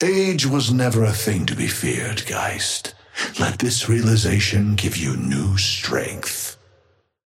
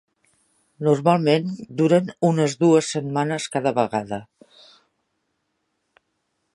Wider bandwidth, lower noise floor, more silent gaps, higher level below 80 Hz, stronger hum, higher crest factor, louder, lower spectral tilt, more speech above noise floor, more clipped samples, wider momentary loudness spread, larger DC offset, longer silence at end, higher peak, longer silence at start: first, 16.5 kHz vs 11.5 kHz; second, -61 dBFS vs -74 dBFS; neither; first, -48 dBFS vs -66 dBFS; neither; about the same, 18 dB vs 20 dB; about the same, -20 LUFS vs -21 LUFS; second, -4.5 dB/octave vs -6 dB/octave; second, 40 dB vs 54 dB; neither; about the same, 8 LU vs 9 LU; neither; second, 0.75 s vs 2.3 s; about the same, -4 dBFS vs -2 dBFS; second, 0 s vs 0.8 s